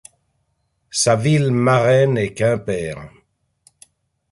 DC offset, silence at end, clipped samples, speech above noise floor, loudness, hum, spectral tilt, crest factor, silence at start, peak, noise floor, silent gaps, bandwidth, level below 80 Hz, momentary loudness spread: under 0.1%; 1.25 s; under 0.1%; 52 dB; -17 LUFS; none; -5.5 dB/octave; 16 dB; 0.95 s; -4 dBFS; -68 dBFS; none; 11.5 kHz; -52 dBFS; 11 LU